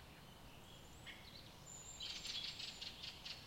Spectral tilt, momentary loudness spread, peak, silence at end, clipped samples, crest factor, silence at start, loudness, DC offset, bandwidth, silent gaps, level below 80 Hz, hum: -1.5 dB/octave; 15 LU; -34 dBFS; 0 s; under 0.1%; 18 dB; 0 s; -50 LUFS; under 0.1%; 16.5 kHz; none; -68 dBFS; none